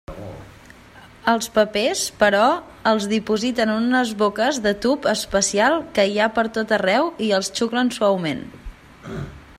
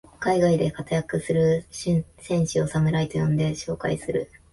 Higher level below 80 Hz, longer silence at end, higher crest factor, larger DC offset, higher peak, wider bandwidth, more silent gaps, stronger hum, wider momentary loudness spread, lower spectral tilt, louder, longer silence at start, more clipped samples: about the same, -48 dBFS vs -48 dBFS; about the same, 0.2 s vs 0.25 s; about the same, 18 dB vs 14 dB; neither; first, -2 dBFS vs -10 dBFS; first, 15.5 kHz vs 11.5 kHz; neither; neither; first, 15 LU vs 6 LU; second, -3.5 dB/octave vs -6.5 dB/octave; first, -20 LUFS vs -24 LUFS; about the same, 0.1 s vs 0.2 s; neither